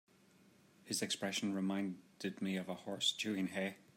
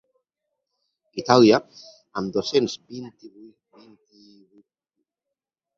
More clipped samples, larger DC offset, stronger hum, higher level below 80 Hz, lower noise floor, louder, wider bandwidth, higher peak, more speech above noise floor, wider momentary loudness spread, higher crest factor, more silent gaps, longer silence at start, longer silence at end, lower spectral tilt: neither; neither; neither; second, -88 dBFS vs -66 dBFS; second, -67 dBFS vs -86 dBFS; second, -39 LUFS vs -20 LUFS; first, 16 kHz vs 7.6 kHz; second, -22 dBFS vs -2 dBFS; second, 27 dB vs 65 dB; second, 9 LU vs 23 LU; second, 18 dB vs 24 dB; neither; second, 0.85 s vs 1.15 s; second, 0.15 s vs 2.5 s; second, -3.5 dB/octave vs -5.5 dB/octave